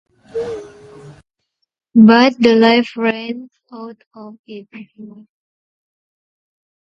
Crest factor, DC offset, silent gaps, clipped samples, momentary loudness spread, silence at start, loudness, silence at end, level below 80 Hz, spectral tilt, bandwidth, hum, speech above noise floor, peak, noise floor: 18 dB; under 0.1%; 4.07-4.11 s, 4.39-4.44 s; under 0.1%; 26 LU; 0.35 s; -13 LUFS; 1.75 s; -58 dBFS; -6.5 dB/octave; 7 kHz; none; 58 dB; 0 dBFS; -73 dBFS